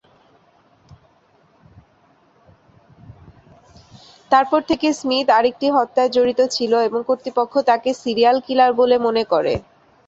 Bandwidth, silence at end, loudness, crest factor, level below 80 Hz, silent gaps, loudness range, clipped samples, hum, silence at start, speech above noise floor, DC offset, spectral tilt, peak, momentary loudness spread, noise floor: 8 kHz; 0.45 s; -18 LUFS; 18 dB; -54 dBFS; none; 6 LU; under 0.1%; none; 4.3 s; 40 dB; under 0.1%; -4 dB/octave; -2 dBFS; 5 LU; -56 dBFS